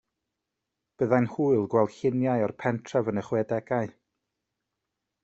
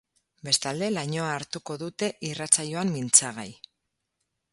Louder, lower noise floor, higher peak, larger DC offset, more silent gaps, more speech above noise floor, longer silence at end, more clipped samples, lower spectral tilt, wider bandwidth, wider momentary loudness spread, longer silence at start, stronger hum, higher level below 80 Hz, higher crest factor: about the same, -27 LUFS vs -25 LUFS; first, -85 dBFS vs -81 dBFS; second, -8 dBFS vs -2 dBFS; neither; neither; first, 59 dB vs 54 dB; first, 1.35 s vs 1 s; neither; first, -8 dB/octave vs -2.5 dB/octave; second, 8 kHz vs 12 kHz; second, 7 LU vs 16 LU; first, 1 s vs 0.45 s; neither; about the same, -68 dBFS vs -70 dBFS; second, 22 dB vs 28 dB